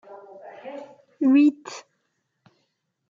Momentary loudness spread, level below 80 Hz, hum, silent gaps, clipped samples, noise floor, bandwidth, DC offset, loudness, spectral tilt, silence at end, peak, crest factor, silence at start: 26 LU; -88 dBFS; none; none; under 0.1%; -75 dBFS; 7.4 kHz; under 0.1%; -20 LUFS; -4.5 dB/octave; 1.3 s; -10 dBFS; 16 dB; 0.65 s